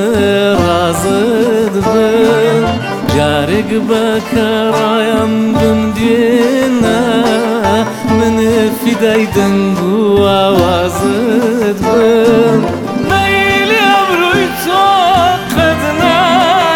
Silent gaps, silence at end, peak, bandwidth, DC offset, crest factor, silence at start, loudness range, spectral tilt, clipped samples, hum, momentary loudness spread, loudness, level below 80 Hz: none; 0 s; 0 dBFS; 19 kHz; under 0.1%; 10 dB; 0 s; 2 LU; -5 dB/octave; under 0.1%; none; 4 LU; -11 LUFS; -38 dBFS